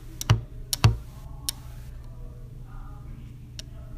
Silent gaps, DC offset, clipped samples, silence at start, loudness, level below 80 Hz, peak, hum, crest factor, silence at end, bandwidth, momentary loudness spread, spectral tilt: none; under 0.1%; under 0.1%; 0 s; -27 LUFS; -38 dBFS; -4 dBFS; none; 26 dB; 0 s; 15.5 kHz; 20 LU; -4.5 dB/octave